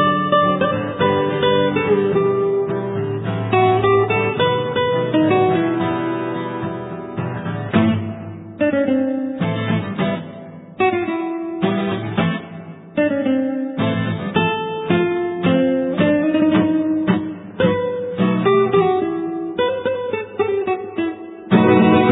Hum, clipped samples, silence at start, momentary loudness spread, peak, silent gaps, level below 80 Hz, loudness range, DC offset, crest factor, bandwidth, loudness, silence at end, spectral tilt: none; under 0.1%; 0 s; 10 LU; 0 dBFS; none; -52 dBFS; 4 LU; under 0.1%; 18 dB; 4 kHz; -19 LUFS; 0 s; -10.5 dB/octave